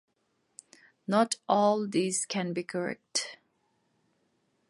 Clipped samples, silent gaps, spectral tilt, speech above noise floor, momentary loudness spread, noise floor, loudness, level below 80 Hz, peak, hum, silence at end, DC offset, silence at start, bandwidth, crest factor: under 0.1%; none; -4 dB/octave; 47 dB; 9 LU; -75 dBFS; -29 LUFS; -80 dBFS; -10 dBFS; none; 1.35 s; under 0.1%; 1.1 s; 11.5 kHz; 20 dB